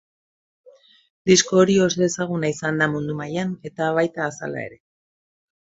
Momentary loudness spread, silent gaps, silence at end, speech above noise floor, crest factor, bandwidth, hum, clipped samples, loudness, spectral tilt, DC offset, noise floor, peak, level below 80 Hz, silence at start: 13 LU; none; 1.05 s; over 69 dB; 20 dB; 8 kHz; none; under 0.1%; -21 LUFS; -4.5 dB/octave; under 0.1%; under -90 dBFS; -4 dBFS; -60 dBFS; 1.25 s